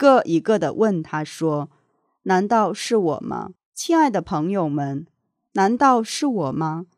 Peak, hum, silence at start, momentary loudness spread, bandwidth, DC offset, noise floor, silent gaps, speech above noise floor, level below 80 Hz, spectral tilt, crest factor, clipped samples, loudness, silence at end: -2 dBFS; none; 0 s; 13 LU; 14.5 kHz; under 0.1%; -59 dBFS; 3.65-3.72 s; 39 dB; -62 dBFS; -5.5 dB/octave; 20 dB; under 0.1%; -21 LUFS; 0.15 s